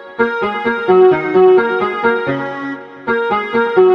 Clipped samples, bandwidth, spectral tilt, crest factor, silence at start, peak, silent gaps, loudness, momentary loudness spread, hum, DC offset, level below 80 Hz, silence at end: under 0.1%; 5.4 kHz; -7.5 dB/octave; 14 dB; 0 s; 0 dBFS; none; -14 LUFS; 12 LU; none; under 0.1%; -56 dBFS; 0 s